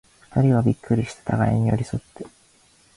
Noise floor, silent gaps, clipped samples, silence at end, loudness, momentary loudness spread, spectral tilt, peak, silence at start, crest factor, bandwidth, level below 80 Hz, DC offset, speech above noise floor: -57 dBFS; none; under 0.1%; 0.7 s; -22 LUFS; 20 LU; -8.5 dB/octave; -8 dBFS; 0.35 s; 16 dB; 11.5 kHz; -46 dBFS; under 0.1%; 36 dB